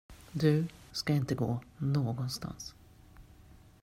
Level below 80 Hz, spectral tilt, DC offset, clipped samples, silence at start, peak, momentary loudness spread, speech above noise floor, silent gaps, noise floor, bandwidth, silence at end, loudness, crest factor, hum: -58 dBFS; -6.5 dB/octave; under 0.1%; under 0.1%; 0.1 s; -14 dBFS; 14 LU; 25 dB; none; -57 dBFS; 15.5 kHz; 0.3 s; -33 LUFS; 20 dB; none